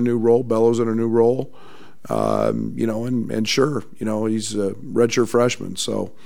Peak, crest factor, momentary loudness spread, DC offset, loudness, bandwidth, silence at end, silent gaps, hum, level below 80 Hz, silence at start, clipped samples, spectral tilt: -4 dBFS; 16 dB; 7 LU; 2%; -20 LUFS; 16 kHz; 0.15 s; none; none; -62 dBFS; 0 s; under 0.1%; -5.5 dB/octave